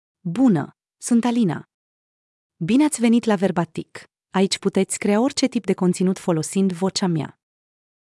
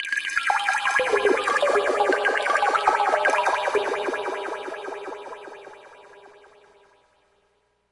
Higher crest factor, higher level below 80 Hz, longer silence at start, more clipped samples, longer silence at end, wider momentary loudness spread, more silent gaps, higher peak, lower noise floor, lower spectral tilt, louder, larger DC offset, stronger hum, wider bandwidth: about the same, 16 dB vs 20 dB; about the same, -68 dBFS vs -66 dBFS; first, 0.25 s vs 0 s; neither; second, 0.85 s vs 1.65 s; second, 12 LU vs 15 LU; first, 1.74-2.50 s vs none; about the same, -6 dBFS vs -4 dBFS; first, under -90 dBFS vs -68 dBFS; first, -5.5 dB/octave vs -1.5 dB/octave; about the same, -21 LUFS vs -22 LUFS; neither; neither; about the same, 12 kHz vs 11.5 kHz